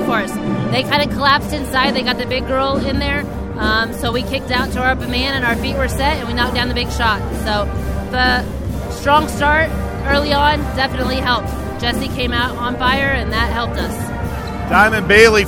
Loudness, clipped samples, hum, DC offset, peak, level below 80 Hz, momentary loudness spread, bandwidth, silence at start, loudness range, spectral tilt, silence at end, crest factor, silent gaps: -17 LUFS; under 0.1%; none; under 0.1%; 0 dBFS; -26 dBFS; 7 LU; 17 kHz; 0 s; 2 LU; -5 dB/octave; 0 s; 16 dB; none